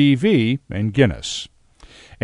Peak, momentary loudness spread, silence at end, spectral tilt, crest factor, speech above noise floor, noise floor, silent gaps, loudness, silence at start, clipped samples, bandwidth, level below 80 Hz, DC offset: 0 dBFS; 12 LU; 0.8 s; -6 dB/octave; 18 dB; 29 dB; -47 dBFS; none; -19 LUFS; 0 s; under 0.1%; 10.5 kHz; -44 dBFS; under 0.1%